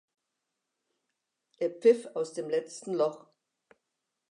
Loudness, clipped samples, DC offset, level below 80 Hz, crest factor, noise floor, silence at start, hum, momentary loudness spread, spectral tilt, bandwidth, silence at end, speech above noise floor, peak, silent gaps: -30 LUFS; under 0.1%; under 0.1%; under -90 dBFS; 22 dB; -85 dBFS; 1.6 s; none; 10 LU; -5 dB/octave; 10.5 kHz; 1.15 s; 56 dB; -12 dBFS; none